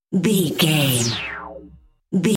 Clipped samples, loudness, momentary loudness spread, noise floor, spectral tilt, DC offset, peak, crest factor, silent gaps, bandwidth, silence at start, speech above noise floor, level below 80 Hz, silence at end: under 0.1%; -19 LUFS; 14 LU; -47 dBFS; -4.5 dB/octave; under 0.1%; -4 dBFS; 16 dB; none; 17 kHz; 0.1 s; 29 dB; -52 dBFS; 0 s